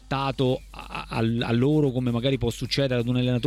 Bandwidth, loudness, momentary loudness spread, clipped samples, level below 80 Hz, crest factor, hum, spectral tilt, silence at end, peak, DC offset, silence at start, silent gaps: 13.5 kHz; -25 LUFS; 9 LU; under 0.1%; -44 dBFS; 14 dB; none; -6.5 dB/octave; 0 s; -10 dBFS; under 0.1%; 0.05 s; none